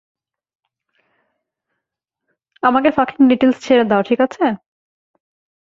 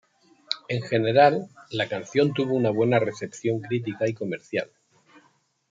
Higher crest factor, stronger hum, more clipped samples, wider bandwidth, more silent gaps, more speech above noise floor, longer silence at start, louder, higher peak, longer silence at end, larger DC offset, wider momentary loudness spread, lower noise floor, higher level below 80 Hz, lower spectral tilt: about the same, 18 dB vs 20 dB; neither; neither; about the same, 7.4 kHz vs 7.8 kHz; neither; first, 67 dB vs 41 dB; first, 2.65 s vs 0.5 s; first, -15 LUFS vs -25 LUFS; about the same, -2 dBFS vs -4 dBFS; first, 1.2 s vs 1.05 s; neither; second, 7 LU vs 13 LU; first, -81 dBFS vs -64 dBFS; first, -58 dBFS vs -70 dBFS; about the same, -6 dB/octave vs -6 dB/octave